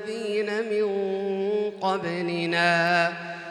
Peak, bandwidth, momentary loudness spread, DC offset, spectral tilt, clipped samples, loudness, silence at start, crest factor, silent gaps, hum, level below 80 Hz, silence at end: -10 dBFS; 11.5 kHz; 7 LU; under 0.1%; -5 dB/octave; under 0.1%; -25 LUFS; 0 s; 16 dB; none; none; -76 dBFS; 0 s